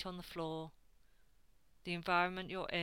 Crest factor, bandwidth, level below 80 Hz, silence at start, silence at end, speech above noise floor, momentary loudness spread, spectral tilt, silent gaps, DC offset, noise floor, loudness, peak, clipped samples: 22 dB; 17 kHz; -64 dBFS; 0 s; 0 s; 32 dB; 15 LU; -5.5 dB/octave; none; under 0.1%; -71 dBFS; -39 LUFS; -20 dBFS; under 0.1%